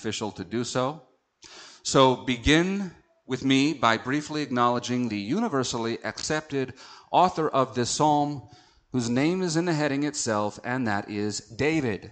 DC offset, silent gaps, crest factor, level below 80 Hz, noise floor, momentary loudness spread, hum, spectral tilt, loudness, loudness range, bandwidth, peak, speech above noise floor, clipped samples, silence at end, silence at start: under 0.1%; none; 20 dB; -50 dBFS; -51 dBFS; 11 LU; none; -4.5 dB/octave; -26 LUFS; 3 LU; 9.2 kHz; -6 dBFS; 26 dB; under 0.1%; 0 s; 0 s